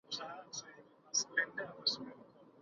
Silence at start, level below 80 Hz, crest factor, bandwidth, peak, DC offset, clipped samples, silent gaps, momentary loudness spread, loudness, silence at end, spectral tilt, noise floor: 0.1 s; -84 dBFS; 22 dB; 7.4 kHz; -20 dBFS; under 0.1%; under 0.1%; none; 18 LU; -38 LUFS; 0 s; 1 dB/octave; -60 dBFS